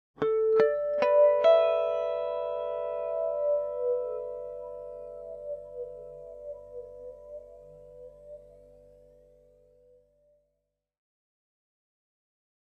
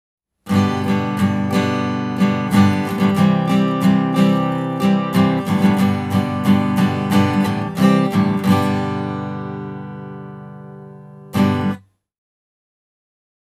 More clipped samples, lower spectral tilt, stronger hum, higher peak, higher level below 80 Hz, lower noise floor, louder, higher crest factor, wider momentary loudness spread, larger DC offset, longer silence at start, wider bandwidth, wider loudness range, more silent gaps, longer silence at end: neither; second, -5.5 dB/octave vs -7 dB/octave; second, 50 Hz at -65 dBFS vs 50 Hz at -35 dBFS; second, -8 dBFS vs -2 dBFS; second, -66 dBFS vs -56 dBFS; first, -82 dBFS vs -38 dBFS; second, -27 LUFS vs -17 LUFS; first, 22 dB vs 16 dB; first, 25 LU vs 16 LU; neither; second, 0.2 s vs 0.45 s; second, 6.2 kHz vs 15 kHz; first, 23 LU vs 9 LU; neither; first, 4.25 s vs 1.65 s